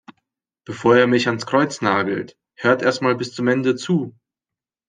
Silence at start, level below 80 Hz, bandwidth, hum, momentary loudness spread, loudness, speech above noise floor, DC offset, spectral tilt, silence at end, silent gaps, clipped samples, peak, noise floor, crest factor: 0.7 s; -64 dBFS; 9.8 kHz; none; 11 LU; -19 LUFS; 70 dB; under 0.1%; -5.5 dB/octave; 0.8 s; none; under 0.1%; -2 dBFS; -88 dBFS; 18 dB